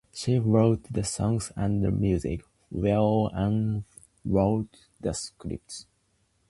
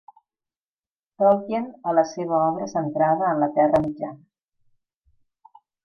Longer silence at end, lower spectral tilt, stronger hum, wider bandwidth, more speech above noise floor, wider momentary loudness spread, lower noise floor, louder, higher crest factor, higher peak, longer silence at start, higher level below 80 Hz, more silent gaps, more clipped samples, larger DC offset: second, 0.65 s vs 1.7 s; about the same, -7 dB/octave vs -7.5 dB/octave; neither; first, 11.5 kHz vs 6.6 kHz; second, 44 dB vs over 68 dB; first, 15 LU vs 9 LU; second, -70 dBFS vs under -90 dBFS; second, -27 LUFS vs -22 LUFS; about the same, 18 dB vs 18 dB; about the same, -8 dBFS vs -6 dBFS; second, 0.15 s vs 1.2 s; first, -44 dBFS vs -60 dBFS; neither; neither; neither